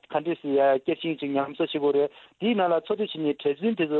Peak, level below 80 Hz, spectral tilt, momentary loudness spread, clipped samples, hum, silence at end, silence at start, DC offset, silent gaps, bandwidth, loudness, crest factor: -12 dBFS; -72 dBFS; -8.5 dB/octave; 6 LU; under 0.1%; none; 0 s; 0.1 s; under 0.1%; none; 4.3 kHz; -26 LUFS; 14 dB